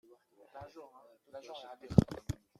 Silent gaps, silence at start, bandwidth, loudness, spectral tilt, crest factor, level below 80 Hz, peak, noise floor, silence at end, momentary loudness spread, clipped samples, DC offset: none; 0.55 s; 14 kHz; -32 LUFS; -8 dB/octave; 28 dB; -52 dBFS; -8 dBFS; -63 dBFS; 0.25 s; 24 LU; under 0.1%; under 0.1%